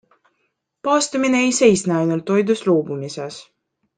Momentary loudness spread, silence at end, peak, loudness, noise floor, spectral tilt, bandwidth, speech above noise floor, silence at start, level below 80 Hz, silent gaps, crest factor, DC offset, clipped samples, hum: 15 LU; 0.55 s; -2 dBFS; -18 LUFS; -71 dBFS; -4.5 dB/octave; 10 kHz; 53 dB; 0.85 s; -62 dBFS; none; 18 dB; under 0.1%; under 0.1%; none